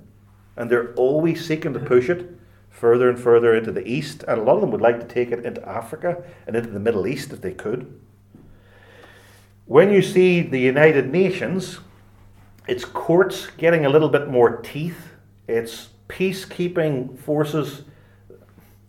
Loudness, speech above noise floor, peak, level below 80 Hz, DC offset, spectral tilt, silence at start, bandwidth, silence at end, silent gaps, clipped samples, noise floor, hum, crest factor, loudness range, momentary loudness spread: -20 LUFS; 31 dB; 0 dBFS; -56 dBFS; under 0.1%; -6.5 dB/octave; 0.55 s; 15.5 kHz; 1.05 s; none; under 0.1%; -51 dBFS; none; 20 dB; 8 LU; 15 LU